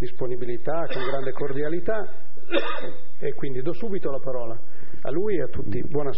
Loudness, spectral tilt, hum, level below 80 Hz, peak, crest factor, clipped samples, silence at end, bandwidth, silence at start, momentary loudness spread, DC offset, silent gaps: -29 LUFS; -5.5 dB/octave; none; -52 dBFS; -6 dBFS; 20 dB; under 0.1%; 0 s; 5.8 kHz; 0 s; 9 LU; 20%; none